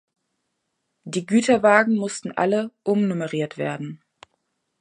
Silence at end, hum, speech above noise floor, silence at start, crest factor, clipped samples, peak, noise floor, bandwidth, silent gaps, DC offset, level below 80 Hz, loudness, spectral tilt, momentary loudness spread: 0.85 s; none; 55 dB; 1.05 s; 22 dB; under 0.1%; -2 dBFS; -76 dBFS; 10.5 kHz; none; under 0.1%; -68 dBFS; -21 LUFS; -5.5 dB/octave; 14 LU